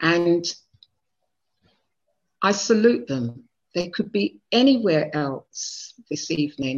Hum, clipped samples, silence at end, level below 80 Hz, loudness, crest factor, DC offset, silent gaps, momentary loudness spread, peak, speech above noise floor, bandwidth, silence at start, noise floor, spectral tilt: none; under 0.1%; 0 s; -64 dBFS; -23 LUFS; 20 dB; under 0.1%; none; 13 LU; -4 dBFS; 58 dB; 7.8 kHz; 0 s; -80 dBFS; -4.5 dB/octave